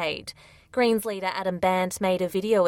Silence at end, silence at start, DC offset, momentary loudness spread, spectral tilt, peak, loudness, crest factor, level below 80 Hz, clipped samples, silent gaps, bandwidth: 0 s; 0 s; under 0.1%; 9 LU; -4.5 dB/octave; -10 dBFS; -26 LUFS; 14 dB; -60 dBFS; under 0.1%; none; 16.5 kHz